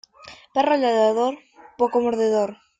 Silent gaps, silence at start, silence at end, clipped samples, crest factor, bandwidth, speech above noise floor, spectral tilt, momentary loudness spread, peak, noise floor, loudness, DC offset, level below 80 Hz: none; 0.25 s; 0.25 s; under 0.1%; 16 dB; 9 kHz; 26 dB; -5 dB/octave; 7 LU; -6 dBFS; -46 dBFS; -21 LUFS; under 0.1%; -66 dBFS